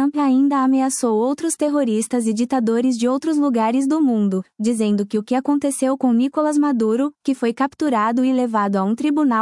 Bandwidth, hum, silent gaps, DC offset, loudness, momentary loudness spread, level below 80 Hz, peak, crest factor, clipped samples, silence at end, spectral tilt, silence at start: 12 kHz; none; none; under 0.1%; -19 LUFS; 4 LU; -70 dBFS; -8 dBFS; 10 dB; under 0.1%; 0 s; -5.5 dB/octave; 0 s